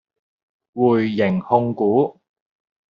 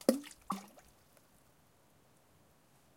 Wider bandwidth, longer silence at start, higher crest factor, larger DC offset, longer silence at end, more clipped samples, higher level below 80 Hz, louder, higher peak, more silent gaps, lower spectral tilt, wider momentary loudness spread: second, 5.6 kHz vs 16.5 kHz; first, 0.75 s vs 0.1 s; second, 18 dB vs 32 dB; neither; second, 0.8 s vs 2.3 s; neither; first, -62 dBFS vs -76 dBFS; first, -19 LUFS vs -40 LUFS; first, -2 dBFS vs -10 dBFS; neither; first, -6.5 dB/octave vs -4.5 dB/octave; second, 5 LU vs 26 LU